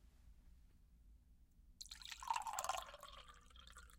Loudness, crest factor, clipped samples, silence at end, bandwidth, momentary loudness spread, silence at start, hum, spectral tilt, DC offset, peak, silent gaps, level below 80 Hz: -47 LUFS; 28 dB; under 0.1%; 0 s; 16.5 kHz; 18 LU; 0 s; none; -0.5 dB/octave; under 0.1%; -24 dBFS; none; -66 dBFS